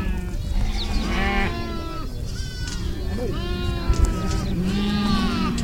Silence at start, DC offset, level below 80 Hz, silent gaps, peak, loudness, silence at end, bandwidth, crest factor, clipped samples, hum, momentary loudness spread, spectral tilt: 0 s; under 0.1%; -26 dBFS; none; -6 dBFS; -25 LUFS; 0 s; 16.5 kHz; 18 dB; under 0.1%; none; 9 LU; -5.5 dB/octave